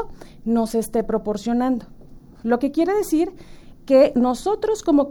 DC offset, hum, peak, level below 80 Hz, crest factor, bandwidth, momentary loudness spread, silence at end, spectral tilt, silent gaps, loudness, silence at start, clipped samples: under 0.1%; none; -4 dBFS; -44 dBFS; 16 dB; 18 kHz; 11 LU; 0 s; -5.5 dB/octave; none; -21 LUFS; 0 s; under 0.1%